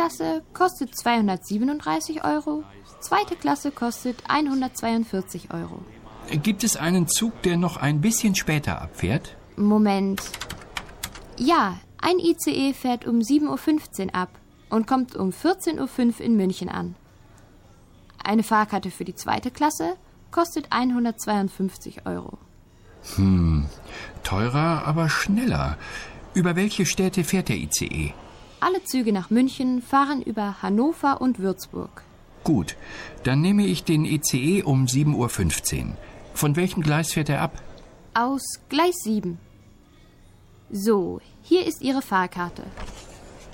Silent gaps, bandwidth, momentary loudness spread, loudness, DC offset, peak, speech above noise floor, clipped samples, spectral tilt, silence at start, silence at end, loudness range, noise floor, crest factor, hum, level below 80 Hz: none; 17 kHz; 13 LU; -24 LUFS; under 0.1%; -8 dBFS; 28 dB; under 0.1%; -5 dB/octave; 0 s; 0 s; 4 LU; -52 dBFS; 16 dB; none; -44 dBFS